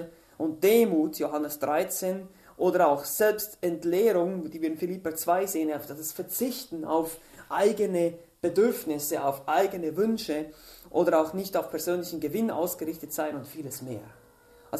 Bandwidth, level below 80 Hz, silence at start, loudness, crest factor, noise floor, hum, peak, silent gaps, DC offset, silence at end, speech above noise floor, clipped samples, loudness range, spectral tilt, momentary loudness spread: 14 kHz; -66 dBFS; 0 s; -28 LUFS; 18 dB; -56 dBFS; none; -10 dBFS; none; under 0.1%; 0 s; 29 dB; under 0.1%; 3 LU; -4.5 dB/octave; 11 LU